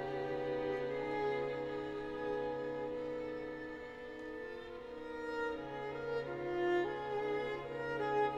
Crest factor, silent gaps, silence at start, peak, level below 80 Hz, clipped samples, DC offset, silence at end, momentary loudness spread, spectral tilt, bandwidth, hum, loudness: 16 dB; none; 0 s; -24 dBFS; -64 dBFS; under 0.1%; under 0.1%; 0 s; 10 LU; -6.5 dB/octave; 9 kHz; none; -40 LUFS